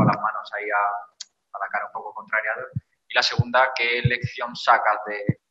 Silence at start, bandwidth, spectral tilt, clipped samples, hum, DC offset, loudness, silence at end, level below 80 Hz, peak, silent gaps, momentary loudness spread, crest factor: 0 s; 8 kHz; -5 dB/octave; under 0.1%; none; under 0.1%; -23 LUFS; 0.15 s; -58 dBFS; -4 dBFS; none; 15 LU; 20 dB